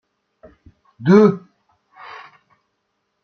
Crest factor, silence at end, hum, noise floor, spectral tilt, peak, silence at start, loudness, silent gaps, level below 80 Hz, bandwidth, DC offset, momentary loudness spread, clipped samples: 18 dB; 1.85 s; none; -72 dBFS; -8.5 dB/octave; -2 dBFS; 1 s; -14 LUFS; none; -62 dBFS; 6.6 kHz; under 0.1%; 26 LU; under 0.1%